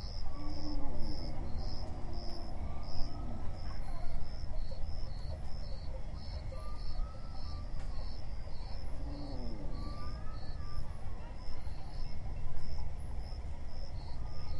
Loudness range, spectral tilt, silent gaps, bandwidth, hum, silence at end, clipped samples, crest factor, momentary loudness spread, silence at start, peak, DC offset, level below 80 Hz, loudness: 2 LU; -6.5 dB/octave; none; 6 kHz; none; 0 s; under 0.1%; 16 dB; 4 LU; 0 s; -16 dBFS; under 0.1%; -40 dBFS; -45 LUFS